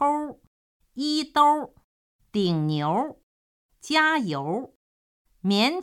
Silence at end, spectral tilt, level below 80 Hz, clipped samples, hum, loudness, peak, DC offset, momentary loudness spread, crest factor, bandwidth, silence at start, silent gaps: 0 s; -5 dB/octave; -66 dBFS; under 0.1%; none; -24 LUFS; -6 dBFS; under 0.1%; 17 LU; 20 dB; 15 kHz; 0 s; 0.47-0.80 s, 1.84-2.19 s, 3.23-3.69 s, 4.76-5.25 s